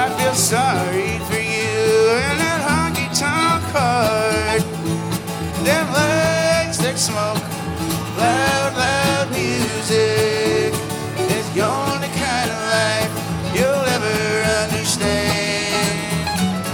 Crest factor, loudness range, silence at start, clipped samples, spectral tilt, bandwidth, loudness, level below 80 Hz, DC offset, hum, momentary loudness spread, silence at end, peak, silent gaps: 16 dB; 2 LU; 0 s; under 0.1%; -4 dB/octave; 18 kHz; -18 LUFS; -44 dBFS; under 0.1%; none; 6 LU; 0 s; -2 dBFS; none